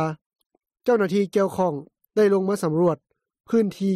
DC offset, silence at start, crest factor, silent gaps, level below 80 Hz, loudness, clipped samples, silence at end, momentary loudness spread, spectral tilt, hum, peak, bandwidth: under 0.1%; 0 s; 14 dB; 0.26-0.30 s, 0.46-0.50 s; -66 dBFS; -23 LUFS; under 0.1%; 0 s; 9 LU; -7 dB/octave; none; -10 dBFS; 14 kHz